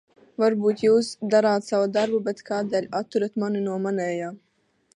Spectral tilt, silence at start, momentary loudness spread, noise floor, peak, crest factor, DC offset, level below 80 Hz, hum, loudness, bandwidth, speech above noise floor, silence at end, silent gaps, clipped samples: -6 dB/octave; 0.4 s; 8 LU; -66 dBFS; -8 dBFS; 16 dB; under 0.1%; -72 dBFS; none; -24 LUFS; 11 kHz; 43 dB; 0.6 s; none; under 0.1%